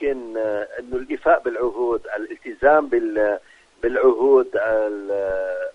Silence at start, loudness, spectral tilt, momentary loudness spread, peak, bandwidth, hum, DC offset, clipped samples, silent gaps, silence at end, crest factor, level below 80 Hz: 0 s; -21 LUFS; -6.5 dB/octave; 12 LU; -2 dBFS; 7 kHz; none; under 0.1%; under 0.1%; none; 0.05 s; 18 dB; -50 dBFS